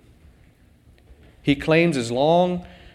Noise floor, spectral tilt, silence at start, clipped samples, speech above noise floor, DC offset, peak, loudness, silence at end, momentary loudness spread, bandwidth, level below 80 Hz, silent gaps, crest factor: -54 dBFS; -6 dB/octave; 1.45 s; under 0.1%; 35 dB; under 0.1%; -4 dBFS; -20 LUFS; 0.25 s; 9 LU; 12 kHz; -50 dBFS; none; 18 dB